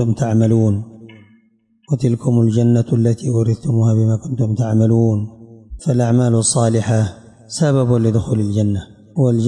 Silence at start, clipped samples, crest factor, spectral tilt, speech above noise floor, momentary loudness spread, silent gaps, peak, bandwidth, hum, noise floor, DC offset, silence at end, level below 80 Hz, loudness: 0 s; under 0.1%; 10 dB; -7 dB/octave; 42 dB; 9 LU; none; -4 dBFS; 11 kHz; none; -57 dBFS; under 0.1%; 0 s; -46 dBFS; -16 LUFS